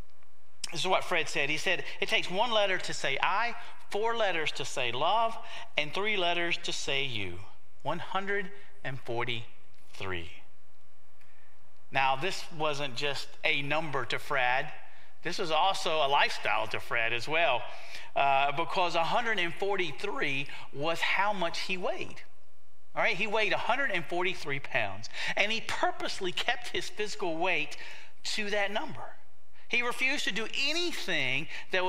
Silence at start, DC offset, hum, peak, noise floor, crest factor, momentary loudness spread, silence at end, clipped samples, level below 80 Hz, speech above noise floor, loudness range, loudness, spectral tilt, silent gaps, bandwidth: 0.65 s; 3%; none; -8 dBFS; -67 dBFS; 22 dB; 11 LU; 0 s; under 0.1%; -66 dBFS; 36 dB; 6 LU; -30 LUFS; -3 dB/octave; none; 16 kHz